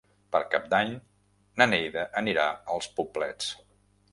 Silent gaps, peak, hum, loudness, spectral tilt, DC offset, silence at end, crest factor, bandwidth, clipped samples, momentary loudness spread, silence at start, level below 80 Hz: none; -4 dBFS; 50 Hz at -55 dBFS; -28 LUFS; -3.5 dB/octave; under 0.1%; 0.55 s; 26 dB; 11.5 kHz; under 0.1%; 11 LU; 0.3 s; -64 dBFS